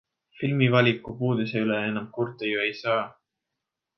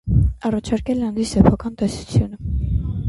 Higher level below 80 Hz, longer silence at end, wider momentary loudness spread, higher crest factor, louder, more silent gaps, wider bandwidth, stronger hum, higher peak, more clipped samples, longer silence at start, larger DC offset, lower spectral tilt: second, -64 dBFS vs -26 dBFS; first, 0.85 s vs 0 s; about the same, 9 LU vs 8 LU; about the same, 20 dB vs 18 dB; second, -25 LUFS vs -20 LUFS; neither; second, 6.2 kHz vs 11.5 kHz; neither; second, -6 dBFS vs 0 dBFS; neither; first, 0.35 s vs 0.05 s; neither; about the same, -8 dB/octave vs -7.5 dB/octave